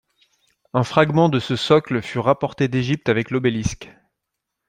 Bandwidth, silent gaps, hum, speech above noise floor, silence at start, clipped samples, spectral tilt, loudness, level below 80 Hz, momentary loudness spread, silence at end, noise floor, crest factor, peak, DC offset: 11 kHz; none; none; 61 dB; 0.75 s; under 0.1%; -6 dB/octave; -20 LUFS; -48 dBFS; 8 LU; 0.8 s; -80 dBFS; 20 dB; -2 dBFS; under 0.1%